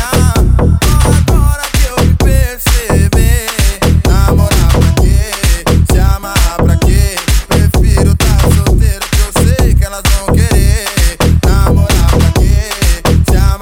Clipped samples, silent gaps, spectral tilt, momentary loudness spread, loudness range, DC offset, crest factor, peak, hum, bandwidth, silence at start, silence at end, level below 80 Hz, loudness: 0.1%; none; -5 dB/octave; 3 LU; 1 LU; 0.3%; 8 dB; 0 dBFS; none; 17.5 kHz; 0 s; 0 s; -10 dBFS; -10 LUFS